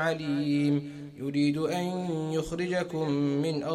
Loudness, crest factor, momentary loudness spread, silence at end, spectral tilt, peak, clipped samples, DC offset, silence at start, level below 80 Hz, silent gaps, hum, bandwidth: -29 LUFS; 12 dB; 5 LU; 0 s; -6.5 dB/octave; -16 dBFS; under 0.1%; under 0.1%; 0 s; -58 dBFS; none; none; 13 kHz